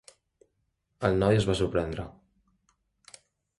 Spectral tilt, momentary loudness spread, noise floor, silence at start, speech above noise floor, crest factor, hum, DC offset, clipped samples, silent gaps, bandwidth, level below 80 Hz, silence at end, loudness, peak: -6.5 dB/octave; 14 LU; -77 dBFS; 1 s; 51 dB; 20 dB; none; under 0.1%; under 0.1%; none; 11.5 kHz; -48 dBFS; 1.5 s; -27 LUFS; -10 dBFS